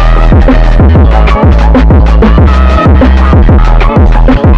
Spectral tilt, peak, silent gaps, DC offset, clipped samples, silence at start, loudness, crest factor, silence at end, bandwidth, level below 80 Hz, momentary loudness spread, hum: -8.5 dB/octave; 0 dBFS; none; under 0.1%; under 0.1%; 0 s; -5 LUFS; 2 dB; 0 s; 6.2 kHz; -4 dBFS; 2 LU; none